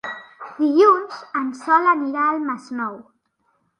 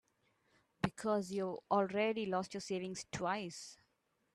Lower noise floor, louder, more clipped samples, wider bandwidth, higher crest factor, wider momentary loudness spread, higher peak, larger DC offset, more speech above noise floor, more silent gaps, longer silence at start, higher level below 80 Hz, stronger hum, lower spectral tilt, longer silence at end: second, -68 dBFS vs -80 dBFS; first, -19 LUFS vs -38 LUFS; neither; second, 10 kHz vs 13 kHz; about the same, 18 dB vs 20 dB; first, 16 LU vs 8 LU; first, -4 dBFS vs -20 dBFS; neither; first, 49 dB vs 42 dB; neither; second, 0.05 s vs 0.85 s; second, -76 dBFS vs -70 dBFS; neither; about the same, -5 dB/octave vs -5 dB/octave; first, 0.8 s vs 0.6 s